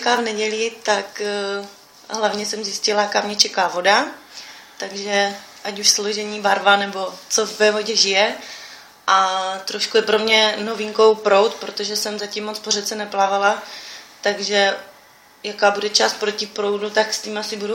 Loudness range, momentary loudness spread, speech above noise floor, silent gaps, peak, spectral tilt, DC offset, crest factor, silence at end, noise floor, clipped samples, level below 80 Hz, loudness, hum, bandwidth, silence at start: 4 LU; 15 LU; 29 dB; none; 0 dBFS; -1 dB/octave; under 0.1%; 20 dB; 0 s; -49 dBFS; under 0.1%; -70 dBFS; -19 LUFS; none; 16.5 kHz; 0 s